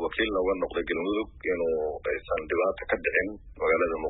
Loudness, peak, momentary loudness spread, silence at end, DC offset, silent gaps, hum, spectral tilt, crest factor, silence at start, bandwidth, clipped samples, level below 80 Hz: -28 LUFS; -12 dBFS; 5 LU; 0 s; under 0.1%; none; none; -9 dB/octave; 16 dB; 0 s; 4 kHz; under 0.1%; -48 dBFS